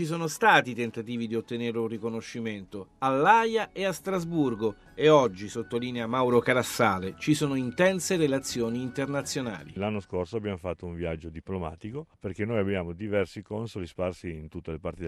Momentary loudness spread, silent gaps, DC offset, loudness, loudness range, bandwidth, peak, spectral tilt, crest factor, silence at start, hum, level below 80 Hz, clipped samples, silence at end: 15 LU; none; under 0.1%; -28 LUFS; 8 LU; 14 kHz; -6 dBFS; -5 dB/octave; 22 dB; 0 s; none; -56 dBFS; under 0.1%; 0 s